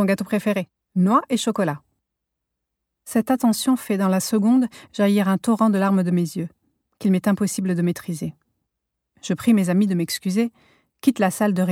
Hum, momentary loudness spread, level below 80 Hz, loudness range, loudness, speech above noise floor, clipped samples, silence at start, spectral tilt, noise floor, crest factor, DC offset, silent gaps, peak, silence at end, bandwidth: none; 9 LU; -66 dBFS; 4 LU; -21 LUFS; 61 dB; under 0.1%; 0 s; -6 dB/octave; -81 dBFS; 16 dB; under 0.1%; none; -6 dBFS; 0 s; 16.5 kHz